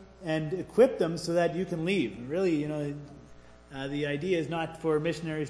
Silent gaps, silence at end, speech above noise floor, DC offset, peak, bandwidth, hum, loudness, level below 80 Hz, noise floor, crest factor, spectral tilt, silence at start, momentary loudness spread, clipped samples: none; 0 s; 23 dB; under 0.1%; -10 dBFS; 11 kHz; none; -29 LUFS; -58 dBFS; -52 dBFS; 20 dB; -6.5 dB/octave; 0 s; 12 LU; under 0.1%